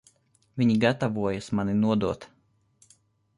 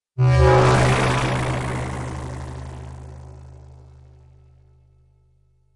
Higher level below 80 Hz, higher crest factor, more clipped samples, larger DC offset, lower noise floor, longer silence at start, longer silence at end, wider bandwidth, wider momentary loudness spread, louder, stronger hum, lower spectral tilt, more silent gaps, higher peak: second, -56 dBFS vs -34 dBFS; about the same, 18 dB vs 16 dB; neither; neither; first, -64 dBFS vs -59 dBFS; first, 0.55 s vs 0.15 s; second, 1.1 s vs 2.2 s; about the same, 11 kHz vs 11.5 kHz; second, 10 LU vs 24 LU; second, -26 LUFS vs -19 LUFS; neither; about the same, -7 dB/octave vs -6 dB/octave; neither; second, -10 dBFS vs -6 dBFS